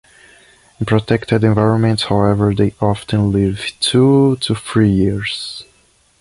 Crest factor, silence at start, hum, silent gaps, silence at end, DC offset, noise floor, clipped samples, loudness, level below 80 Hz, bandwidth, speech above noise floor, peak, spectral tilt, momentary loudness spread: 14 dB; 0.8 s; none; none; 0.6 s; under 0.1%; -55 dBFS; under 0.1%; -15 LUFS; -38 dBFS; 11.5 kHz; 40 dB; -2 dBFS; -6.5 dB/octave; 9 LU